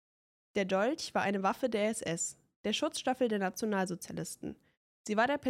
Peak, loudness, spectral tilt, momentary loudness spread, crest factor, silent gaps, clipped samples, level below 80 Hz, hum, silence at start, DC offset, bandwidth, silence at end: -18 dBFS; -34 LUFS; -4 dB/octave; 10 LU; 16 dB; 2.56-2.64 s, 4.77-5.05 s; under 0.1%; -72 dBFS; none; 0.55 s; under 0.1%; 16 kHz; 0 s